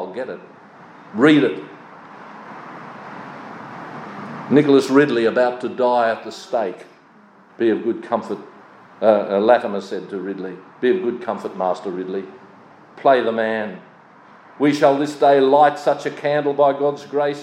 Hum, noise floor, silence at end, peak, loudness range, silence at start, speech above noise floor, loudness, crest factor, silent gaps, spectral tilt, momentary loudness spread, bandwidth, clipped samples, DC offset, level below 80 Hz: none; -49 dBFS; 0 s; 0 dBFS; 5 LU; 0 s; 31 dB; -18 LUFS; 18 dB; none; -6 dB/octave; 21 LU; 11 kHz; under 0.1%; under 0.1%; -78 dBFS